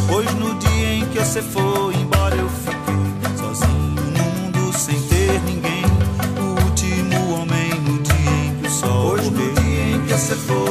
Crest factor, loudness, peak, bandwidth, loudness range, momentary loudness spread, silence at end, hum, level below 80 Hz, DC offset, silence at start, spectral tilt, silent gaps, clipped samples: 16 dB; -19 LUFS; -2 dBFS; 15.5 kHz; 1 LU; 3 LU; 0 s; none; -30 dBFS; under 0.1%; 0 s; -5 dB/octave; none; under 0.1%